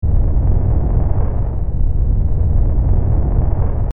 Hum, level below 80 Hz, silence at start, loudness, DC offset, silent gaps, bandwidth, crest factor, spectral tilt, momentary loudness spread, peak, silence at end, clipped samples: none; -16 dBFS; 0 s; -18 LUFS; under 0.1%; none; 2.2 kHz; 12 dB; -13 dB/octave; 4 LU; -2 dBFS; 0 s; under 0.1%